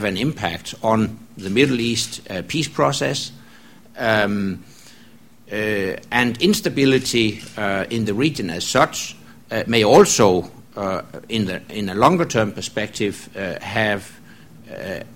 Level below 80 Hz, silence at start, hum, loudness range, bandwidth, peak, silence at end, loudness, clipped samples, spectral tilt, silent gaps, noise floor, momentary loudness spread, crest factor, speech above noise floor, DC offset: -50 dBFS; 0 s; none; 5 LU; 16.5 kHz; 0 dBFS; 0 s; -20 LUFS; under 0.1%; -4.5 dB/octave; none; -49 dBFS; 12 LU; 20 dB; 29 dB; 0.4%